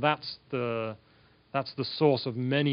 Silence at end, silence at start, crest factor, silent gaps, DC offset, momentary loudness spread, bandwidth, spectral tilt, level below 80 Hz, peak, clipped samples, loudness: 0 s; 0 s; 20 dB; none; under 0.1%; 9 LU; 5.4 kHz; -4.5 dB/octave; -72 dBFS; -10 dBFS; under 0.1%; -30 LUFS